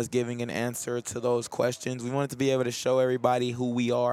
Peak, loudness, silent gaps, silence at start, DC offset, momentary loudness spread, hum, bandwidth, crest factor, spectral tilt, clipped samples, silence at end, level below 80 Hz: -8 dBFS; -28 LUFS; none; 0 s; under 0.1%; 6 LU; none; 16 kHz; 20 dB; -5 dB/octave; under 0.1%; 0 s; -68 dBFS